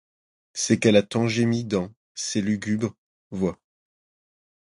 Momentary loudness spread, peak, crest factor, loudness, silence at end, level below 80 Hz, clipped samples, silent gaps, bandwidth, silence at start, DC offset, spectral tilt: 13 LU; -4 dBFS; 22 dB; -24 LUFS; 1.15 s; -56 dBFS; under 0.1%; 1.97-2.15 s, 2.98-3.31 s; 11.5 kHz; 0.55 s; under 0.1%; -5 dB/octave